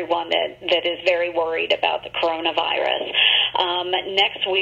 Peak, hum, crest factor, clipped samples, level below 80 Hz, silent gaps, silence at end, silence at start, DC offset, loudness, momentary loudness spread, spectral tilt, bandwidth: -4 dBFS; none; 18 dB; under 0.1%; -60 dBFS; none; 0 s; 0 s; under 0.1%; -20 LUFS; 7 LU; -3 dB/octave; 7.6 kHz